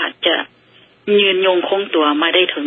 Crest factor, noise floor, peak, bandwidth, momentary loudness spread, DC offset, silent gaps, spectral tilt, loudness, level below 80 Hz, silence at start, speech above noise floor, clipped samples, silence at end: 16 dB; -49 dBFS; 0 dBFS; 4 kHz; 7 LU; under 0.1%; none; -7.5 dB/octave; -15 LUFS; -74 dBFS; 0 s; 35 dB; under 0.1%; 0 s